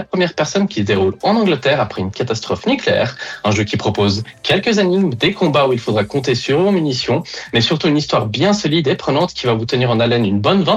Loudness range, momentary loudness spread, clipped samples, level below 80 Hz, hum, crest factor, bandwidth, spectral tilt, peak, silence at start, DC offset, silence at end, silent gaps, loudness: 1 LU; 5 LU; under 0.1%; -50 dBFS; none; 12 dB; 10.5 kHz; -5.5 dB/octave; -4 dBFS; 0 s; under 0.1%; 0 s; none; -16 LUFS